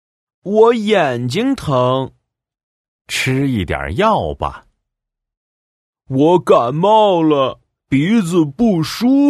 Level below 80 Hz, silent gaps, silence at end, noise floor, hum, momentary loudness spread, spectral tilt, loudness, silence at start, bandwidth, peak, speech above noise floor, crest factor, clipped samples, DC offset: -42 dBFS; 2.63-2.99 s, 5.37-5.93 s; 0 s; -80 dBFS; none; 10 LU; -6.5 dB/octave; -15 LUFS; 0.45 s; 14.5 kHz; 0 dBFS; 66 dB; 16 dB; under 0.1%; under 0.1%